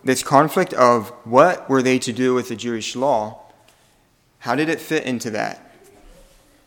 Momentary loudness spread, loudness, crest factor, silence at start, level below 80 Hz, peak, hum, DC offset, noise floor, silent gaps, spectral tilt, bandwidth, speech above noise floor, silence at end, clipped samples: 11 LU; -19 LUFS; 20 dB; 0.05 s; -58 dBFS; 0 dBFS; none; under 0.1%; -59 dBFS; none; -4.5 dB/octave; 19 kHz; 40 dB; 1.1 s; under 0.1%